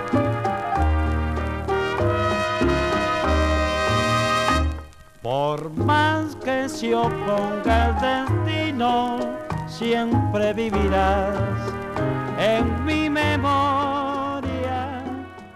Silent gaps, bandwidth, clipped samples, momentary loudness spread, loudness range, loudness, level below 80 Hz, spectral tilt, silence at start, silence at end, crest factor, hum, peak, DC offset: none; 14 kHz; under 0.1%; 7 LU; 1 LU; -22 LUFS; -32 dBFS; -6 dB/octave; 0 s; 0.05 s; 16 dB; none; -6 dBFS; under 0.1%